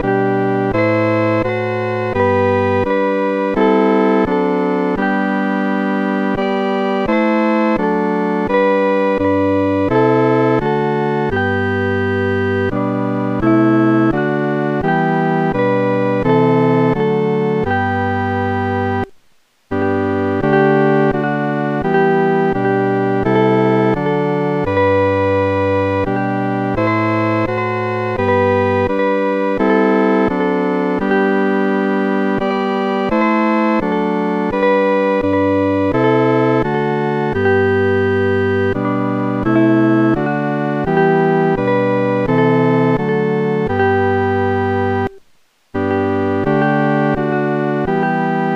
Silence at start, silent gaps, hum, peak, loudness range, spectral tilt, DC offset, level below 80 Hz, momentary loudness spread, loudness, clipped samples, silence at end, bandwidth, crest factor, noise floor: 0 s; none; none; -2 dBFS; 2 LU; -8.5 dB/octave; under 0.1%; -42 dBFS; 5 LU; -15 LUFS; under 0.1%; 0 s; 7.4 kHz; 14 dB; -54 dBFS